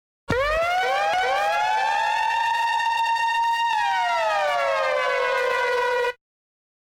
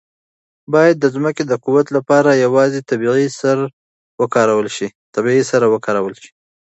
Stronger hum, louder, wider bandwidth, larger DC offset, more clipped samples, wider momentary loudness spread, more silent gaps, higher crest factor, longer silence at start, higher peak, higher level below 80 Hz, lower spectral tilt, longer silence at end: neither; second, -22 LUFS vs -15 LUFS; first, 16.5 kHz vs 8.2 kHz; neither; neither; second, 1 LU vs 9 LU; second, none vs 3.73-4.18 s, 4.95-5.13 s; about the same, 12 dB vs 16 dB; second, 0.3 s vs 0.7 s; second, -10 dBFS vs 0 dBFS; first, -50 dBFS vs -64 dBFS; second, -2.5 dB/octave vs -6 dB/octave; first, 0.85 s vs 0.5 s